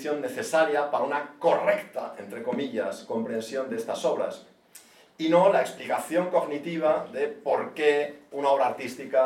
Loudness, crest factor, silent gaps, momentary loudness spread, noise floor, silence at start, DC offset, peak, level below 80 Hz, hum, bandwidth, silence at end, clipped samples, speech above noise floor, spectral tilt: -27 LUFS; 20 dB; none; 9 LU; -53 dBFS; 0 s; under 0.1%; -8 dBFS; -80 dBFS; none; 16.5 kHz; 0 s; under 0.1%; 27 dB; -5 dB/octave